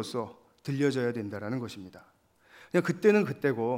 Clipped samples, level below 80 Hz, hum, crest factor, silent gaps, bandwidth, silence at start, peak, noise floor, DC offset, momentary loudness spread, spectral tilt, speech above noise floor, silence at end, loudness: under 0.1%; -76 dBFS; none; 20 dB; none; 16 kHz; 0 s; -10 dBFS; -59 dBFS; under 0.1%; 18 LU; -6.5 dB/octave; 30 dB; 0 s; -29 LUFS